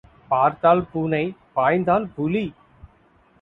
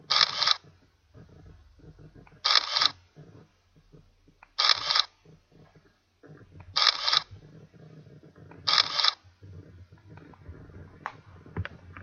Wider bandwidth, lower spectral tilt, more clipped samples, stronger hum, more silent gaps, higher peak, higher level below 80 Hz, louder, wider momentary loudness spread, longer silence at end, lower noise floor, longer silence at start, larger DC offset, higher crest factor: second, 4.2 kHz vs 10.5 kHz; first, -9.5 dB/octave vs -1 dB/octave; neither; neither; neither; about the same, -4 dBFS vs -2 dBFS; first, -54 dBFS vs -60 dBFS; first, -21 LUFS vs -24 LUFS; second, 8 LU vs 21 LU; first, 0.9 s vs 0 s; second, -57 dBFS vs -62 dBFS; first, 0.3 s vs 0.1 s; neither; second, 18 dB vs 30 dB